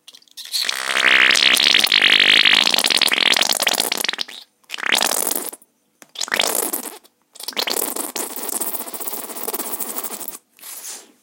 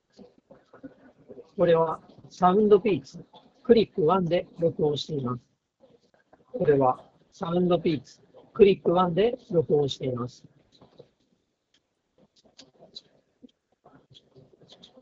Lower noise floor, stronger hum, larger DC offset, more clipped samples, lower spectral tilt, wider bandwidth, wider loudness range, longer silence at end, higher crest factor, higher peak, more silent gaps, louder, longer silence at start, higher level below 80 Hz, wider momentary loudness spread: second, -52 dBFS vs -73 dBFS; neither; neither; neither; second, 1.5 dB/octave vs -6 dB/octave; first, 17.5 kHz vs 7.6 kHz; first, 11 LU vs 6 LU; second, 0.2 s vs 4.7 s; about the same, 20 dB vs 22 dB; first, 0 dBFS vs -4 dBFS; neither; first, -16 LUFS vs -24 LUFS; second, 0.35 s vs 0.85 s; second, -78 dBFS vs -60 dBFS; about the same, 20 LU vs 18 LU